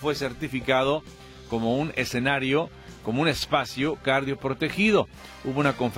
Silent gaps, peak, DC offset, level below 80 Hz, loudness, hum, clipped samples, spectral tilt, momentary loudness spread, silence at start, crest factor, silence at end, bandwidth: none; -8 dBFS; under 0.1%; -50 dBFS; -25 LUFS; none; under 0.1%; -5.5 dB/octave; 11 LU; 0 s; 18 dB; 0 s; 16.5 kHz